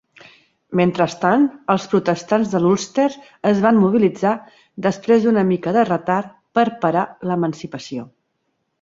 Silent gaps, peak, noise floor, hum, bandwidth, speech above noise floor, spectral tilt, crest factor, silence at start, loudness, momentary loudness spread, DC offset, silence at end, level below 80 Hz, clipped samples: none; -2 dBFS; -71 dBFS; none; 7.8 kHz; 53 dB; -6.5 dB/octave; 16 dB; 0.7 s; -18 LUFS; 9 LU; under 0.1%; 0.75 s; -60 dBFS; under 0.1%